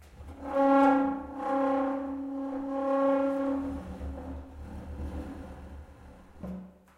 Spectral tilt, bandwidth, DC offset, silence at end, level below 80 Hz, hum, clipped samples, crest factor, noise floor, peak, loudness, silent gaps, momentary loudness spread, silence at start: -8 dB/octave; 8.8 kHz; under 0.1%; 0.25 s; -48 dBFS; none; under 0.1%; 20 dB; -51 dBFS; -12 dBFS; -29 LUFS; none; 20 LU; 0 s